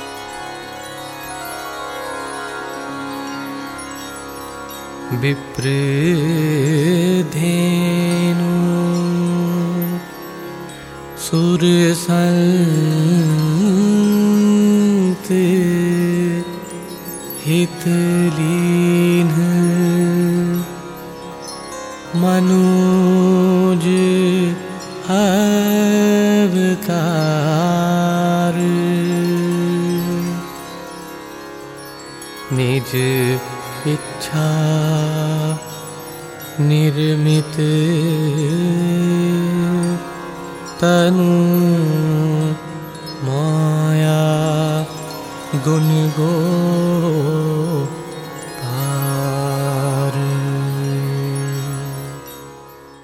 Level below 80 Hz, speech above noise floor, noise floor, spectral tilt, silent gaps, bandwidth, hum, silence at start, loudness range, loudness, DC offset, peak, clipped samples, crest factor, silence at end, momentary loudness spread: -52 dBFS; 24 dB; -39 dBFS; -6.5 dB/octave; none; 16 kHz; none; 0 s; 7 LU; -17 LUFS; under 0.1%; -4 dBFS; under 0.1%; 12 dB; 0.05 s; 16 LU